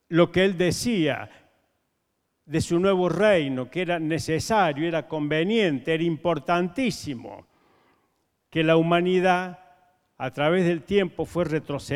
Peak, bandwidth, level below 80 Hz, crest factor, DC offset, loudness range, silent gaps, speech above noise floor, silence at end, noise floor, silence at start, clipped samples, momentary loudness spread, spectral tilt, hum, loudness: -6 dBFS; 15 kHz; -54 dBFS; 20 dB; under 0.1%; 3 LU; none; 52 dB; 0 s; -75 dBFS; 0.1 s; under 0.1%; 10 LU; -5.5 dB/octave; none; -24 LUFS